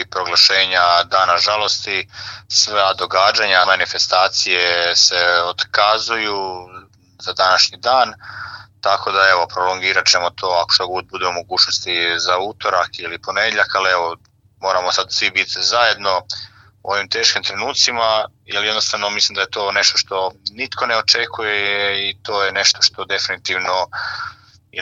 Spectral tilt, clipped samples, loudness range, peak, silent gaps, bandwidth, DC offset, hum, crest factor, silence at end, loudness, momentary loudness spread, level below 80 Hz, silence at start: 0 dB/octave; under 0.1%; 4 LU; 0 dBFS; none; 15.5 kHz; under 0.1%; none; 18 dB; 0 s; -15 LUFS; 11 LU; -58 dBFS; 0 s